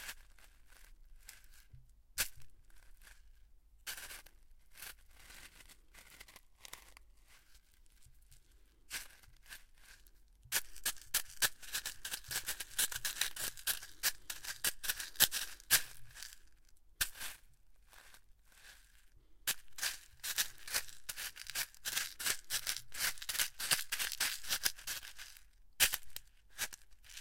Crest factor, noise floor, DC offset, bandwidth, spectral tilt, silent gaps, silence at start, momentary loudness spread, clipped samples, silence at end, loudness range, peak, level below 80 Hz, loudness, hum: 36 dB; -63 dBFS; under 0.1%; 17 kHz; 1.5 dB/octave; none; 0 s; 24 LU; under 0.1%; 0 s; 18 LU; -6 dBFS; -62 dBFS; -37 LUFS; none